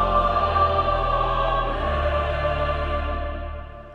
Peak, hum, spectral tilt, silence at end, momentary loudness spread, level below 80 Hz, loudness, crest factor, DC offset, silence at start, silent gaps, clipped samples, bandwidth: -8 dBFS; none; -7.5 dB/octave; 0 s; 11 LU; -30 dBFS; -23 LUFS; 14 dB; under 0.1%; 0 s; none; under 0.1%; 6.8 kHz